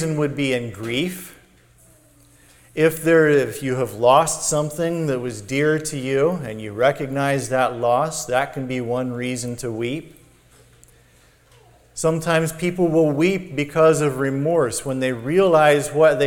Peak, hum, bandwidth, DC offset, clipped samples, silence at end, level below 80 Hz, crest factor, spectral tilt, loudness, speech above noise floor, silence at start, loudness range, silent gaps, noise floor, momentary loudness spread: -2 dBFS; none; 19 kHz; under 0.1%; under 0.1%; 0 s; -52 dBFS; 18 dB; -5 dB/octave; -20 LUFS; 34 dB; 0 s; 8 LU; none; -54 dBFS; 11 LU